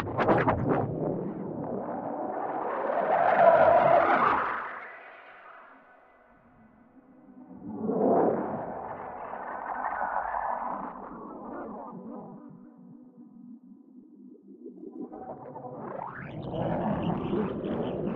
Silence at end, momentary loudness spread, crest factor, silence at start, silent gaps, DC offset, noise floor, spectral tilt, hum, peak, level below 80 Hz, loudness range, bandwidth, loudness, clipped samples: 0 s; 24 LU; 22 dB; 0 s; none; under 0.1%; -58 dBFS; -9.5 dB/octave; none; -8 dBFS; -58 dBFS; 21 LU; 5.4 kHz; -28 LUFS; under 0.1%